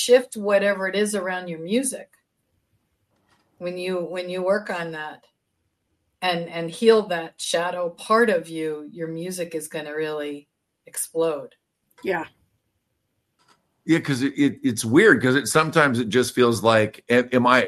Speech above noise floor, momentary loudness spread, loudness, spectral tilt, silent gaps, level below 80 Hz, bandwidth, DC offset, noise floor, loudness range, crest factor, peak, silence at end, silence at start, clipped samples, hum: 53 dB; 14 LU; -22 LUFS; -4.5 dB/octave; none; -66 dBFS; 13 kHz; under 0.1%; -74 dBFS; 11 LU; 22 dB; 0 dBFS; 0 s; 0 s; under 0.1%; none